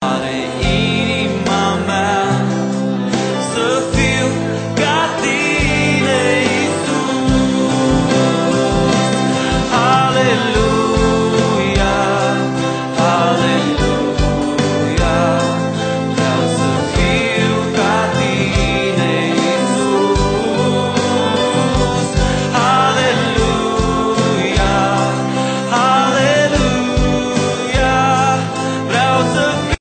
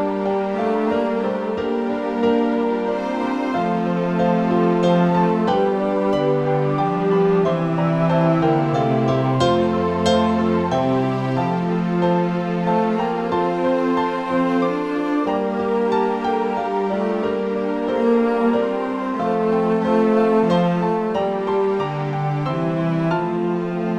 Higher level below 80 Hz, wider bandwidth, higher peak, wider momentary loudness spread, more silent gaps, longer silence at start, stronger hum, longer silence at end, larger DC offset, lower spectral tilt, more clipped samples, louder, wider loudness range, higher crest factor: first, -28 dBFS vs -52 dBFS; about the same, 9.2 kHz vs 9 kHz; first, 0 dBFS vs -4 dBFS; about the same, 4 LU vs 5 LU; neither; about the same, 0 s vs 0 s; neither; about the same, 0.05 s vs 0 s; neither; second, -5 dB/octave vs -8 dB/octave; neither; first, -15 LUFS vs -20 LUFS; about the same, 2 LU vs 3 LU; about the same, 14 dB vs 14 dB